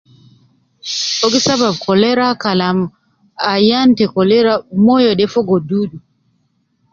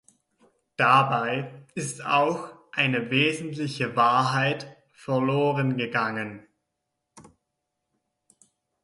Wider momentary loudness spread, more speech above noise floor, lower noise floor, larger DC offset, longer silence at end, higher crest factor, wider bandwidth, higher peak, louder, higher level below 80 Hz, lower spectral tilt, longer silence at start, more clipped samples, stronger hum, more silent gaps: second, 9 LU vs 14 LU; second, 49 dB vs 57 dB; second, -62 dBFS vs -81 dBFS; neither; second, 0.95 s vs 1.6 s; second, 14 dB vs 20 dB; second, 7.6 kHz vs 11.5 kHz; first, 0 dBFS vs -6 dBFS; first, -14 LUFS vs -24 LUFS; first, -54 dBFS vs -70 dBFS; about the same, -4.5 dB/octave vs -5 dB/octave; about the same, 0.85 s vs 0.8 s; neither; neither; neither